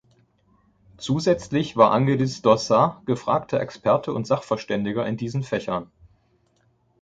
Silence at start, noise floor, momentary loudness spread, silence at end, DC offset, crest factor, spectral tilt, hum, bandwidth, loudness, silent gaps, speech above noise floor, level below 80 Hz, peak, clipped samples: 1 s; -65 dBFS; 9 LU; 1.15 s; under 0.1%; 22 dB; -6.5 dB/octave; none; 9 kHz; -22 LUFS; none; 43 dB; -56 dBFS; -2 dBFS; under 0.1%